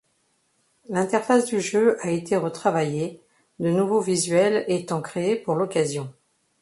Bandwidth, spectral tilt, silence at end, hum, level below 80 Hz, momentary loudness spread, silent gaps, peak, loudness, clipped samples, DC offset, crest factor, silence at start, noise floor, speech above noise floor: 11.5 kHz; -5 dB/octave; 0.5 s; none; -68 dBFS; 8 LU; none; -6 dBFS; -23 LUFS; under 0.1%; under 0.1%; 18 dB; 0.9 s; -68 dBFS; 46 dB